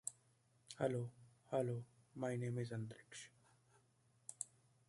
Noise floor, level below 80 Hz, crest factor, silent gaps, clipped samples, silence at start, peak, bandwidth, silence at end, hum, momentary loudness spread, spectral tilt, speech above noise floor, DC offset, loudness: -76 dBFS; -82 dBFS; 24 dB; none; under 0.1%; 0.05 s; -22 dBFS; 11.5 kHz; 0.45 s; none; 16 LU; -5.5 dB/octave; 33 dB; under 0.1%; -46 LUFS